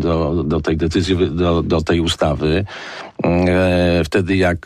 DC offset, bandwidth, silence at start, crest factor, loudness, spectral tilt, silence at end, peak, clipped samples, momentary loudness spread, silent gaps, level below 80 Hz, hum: under 0.1%; 12.5 kHz; 0 s; 10 dB; -17 LUFS; -6.5 dB/octave; 0.05 s; -6 dBFS; under 0.1%; 6 LU; none; -32 dBFS; none